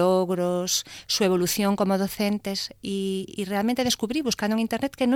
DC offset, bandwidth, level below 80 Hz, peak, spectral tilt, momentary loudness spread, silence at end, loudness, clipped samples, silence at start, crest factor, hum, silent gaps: under 0.1%; 18 kHz; -58 dBFS; -8 dBFS; -4 dB/octave; 7 LU; 0 s; -25 LUFS; under 0.1%; 0 s; 16 dB; none; none